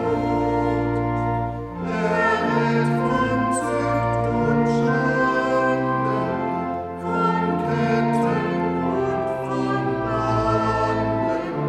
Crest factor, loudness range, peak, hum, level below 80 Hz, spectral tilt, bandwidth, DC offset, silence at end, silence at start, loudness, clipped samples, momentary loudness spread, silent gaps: 14 dB; 2 LU; -8 dBFS; none; -42 dBFS; -7 dB/octave; 12 kHz; under 0.1%; 0 s; 0 s; -22 LUFS; under 0.1%; 5 LU; none